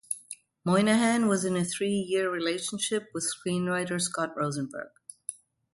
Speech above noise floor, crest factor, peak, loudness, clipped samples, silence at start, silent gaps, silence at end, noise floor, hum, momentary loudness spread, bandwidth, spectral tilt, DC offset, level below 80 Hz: 21 dB; 16 dB; -12 dBFS; -28 LUFS; under 0.1%; 0.1 s; none; 0.45 s; -48 dBFS; none; 16 LU; 12 kHz; -4 dB/octave; under 0.1%; -70 dBFS